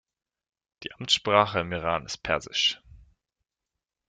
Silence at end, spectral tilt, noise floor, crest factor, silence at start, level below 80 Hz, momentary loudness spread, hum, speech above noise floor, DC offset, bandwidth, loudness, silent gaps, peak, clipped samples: 1.35 s; -3 dB/octave; -87 dBFS; 24 dB; 0.8 s; -56 dBFS; 18 LU; none; 61 dB; under 0.1%; 9.6 kHz; -25 LUFS; none; -6 dBFS; under 0.1%